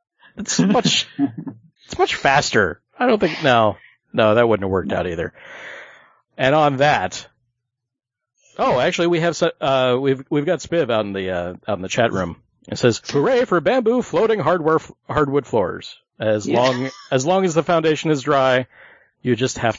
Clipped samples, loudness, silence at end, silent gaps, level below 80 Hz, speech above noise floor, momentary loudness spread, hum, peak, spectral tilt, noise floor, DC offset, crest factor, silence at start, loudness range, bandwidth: under 0.1%; -19 LUFS; 0 s; none; -52 dBFS; 64 dB; 13 LU; none; 0 dBFS; -5 dB/octave; -83 dBFS; under 0.1%; 18 dB; 0.35 s; 3 LU; 7.8 kHz